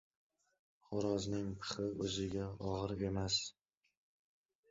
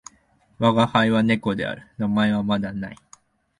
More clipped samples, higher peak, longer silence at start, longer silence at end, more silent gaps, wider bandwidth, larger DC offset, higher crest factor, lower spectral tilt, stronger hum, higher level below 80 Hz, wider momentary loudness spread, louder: neither; second, -24 dBFS vs -4 dBFS; first, 0.9 s vs 0.6 s; first, 1.2 s vs 0.65 s; neither; second, 7.6 kHz vs 10.5 kHz; neither; about the same, 18 dB vs 18 dB; second, -5 dB/octave vs -6.5 dB/octave; neither; second, -60 dBFS vs -54 dBFS; second, 6 LU vs 12 LU; second, -40 LUFS vs -22 LUFS